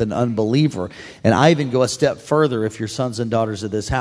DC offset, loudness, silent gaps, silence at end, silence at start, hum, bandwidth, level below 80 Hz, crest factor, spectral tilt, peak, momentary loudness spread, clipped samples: under 0.1%; -19 LUFS; none; 0 s; 0 s; none; 11 kHz; -44 dBFS; 18 dB; -6 dB/octave; 0 dBFS; 9 LU; under 0.1%